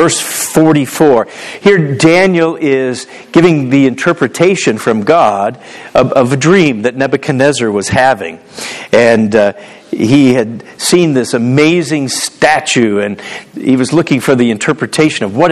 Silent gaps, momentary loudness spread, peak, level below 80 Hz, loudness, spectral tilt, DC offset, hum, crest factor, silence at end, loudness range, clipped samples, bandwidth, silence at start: none; 9 LU; 0 dBFS; -46 dBFS; -10 LUFS; -5 dB/octave; under 0.1%; none; 10 dB; 0 s; 2 LU; 0.6%; 14 kHz; 0 s